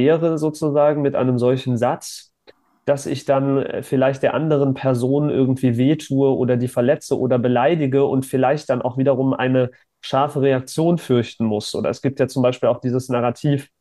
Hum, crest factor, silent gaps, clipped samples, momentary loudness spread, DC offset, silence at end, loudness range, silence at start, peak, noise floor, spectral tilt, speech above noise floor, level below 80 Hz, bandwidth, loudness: none; 14 dB; none; under 0.1%; 5 LU; under 0.1%; 0.15 s; 2 LU; 0 s; -4 dBFS; -53 dBFS; -7 dB/octave; 35 dB; -62 dBFS; 12.5 kHz; -19 LUFS